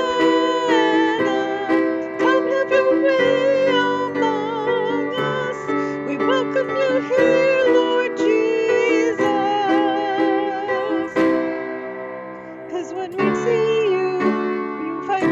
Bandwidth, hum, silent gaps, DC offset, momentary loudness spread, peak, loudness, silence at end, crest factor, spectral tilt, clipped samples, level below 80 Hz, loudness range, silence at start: 7.8 kHz; none; none; under 0.1%; 10 LU; -6 dBFS; -19 LUFS; 0 s; 14 dB; -5 dB/octave; under 0.1%; -60 dBFS; 4 LU; 0 s